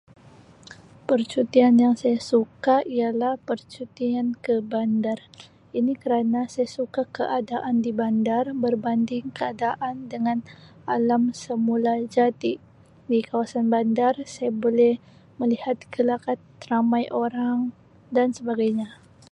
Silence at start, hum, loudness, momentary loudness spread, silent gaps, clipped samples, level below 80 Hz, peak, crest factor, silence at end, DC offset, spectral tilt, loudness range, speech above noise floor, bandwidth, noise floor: 0.7 s; none; -24 LUFS; 9 LU; none; under 0.1%; -66 dBFS; -6 dBFS; 18 dB; 0.4 s; under 0.1%; -6.5 dB/octave; 4 LU; 27 dB; 9.6 kHz; -50 dBFS